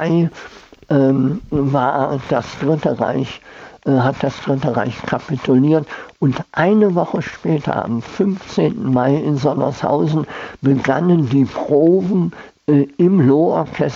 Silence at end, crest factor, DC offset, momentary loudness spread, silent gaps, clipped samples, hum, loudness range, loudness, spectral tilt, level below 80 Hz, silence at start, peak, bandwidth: 0 s; 14 dB; under 0.1%; 8 LU; none; under 0.1%; none; 3 LU; -17 LUFS; -8.5 dB/octave; -50 dBFS; 0 s; -2 dBFS; 7.4 kHz